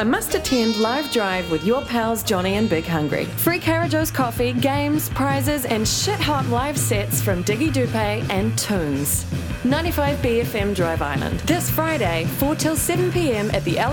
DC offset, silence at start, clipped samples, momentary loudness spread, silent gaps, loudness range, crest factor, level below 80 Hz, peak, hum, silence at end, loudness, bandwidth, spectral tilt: under 0.1%; 0 s; under 0.1%; 2 LU; none; 1 LU; 16 dB; -36 dBFS; -4 dBFS; none; 0 s; -21 LUFS; 19.5 kHz; -4.5 dB/octave